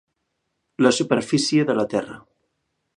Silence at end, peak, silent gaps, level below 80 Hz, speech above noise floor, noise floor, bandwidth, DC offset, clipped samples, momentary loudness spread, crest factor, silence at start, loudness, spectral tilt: 0.8 s; -2 dBFS; none; -64 dBFS; 55 dB; -76 dBFS; 11.5 kHz; under 0.1%; under 0.1%; 8 LU; 22 dB; 0.8 s; -20 LUFS; -4.5 dB/octave